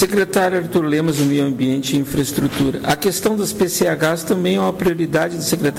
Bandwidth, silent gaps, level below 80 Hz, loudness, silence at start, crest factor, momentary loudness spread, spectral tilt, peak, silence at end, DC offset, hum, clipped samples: 16.5 kHz; none; -46 dBFS; -18 LUFS; 0 s; 12 dB; 3 LU; -5 dB/octave; -6 dBFS; 0 s; under 0.1%; none; under 0.1%